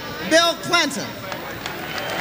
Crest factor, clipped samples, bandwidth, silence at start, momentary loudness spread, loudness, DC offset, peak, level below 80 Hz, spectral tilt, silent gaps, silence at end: 18 dB; under 0.1%; 16.5 kHz; 0 s; 13 LU; -21 LUFS; under 0.1%; -4 dBFS; -52 dBFS; -2.5 dB/octave; none; 0 s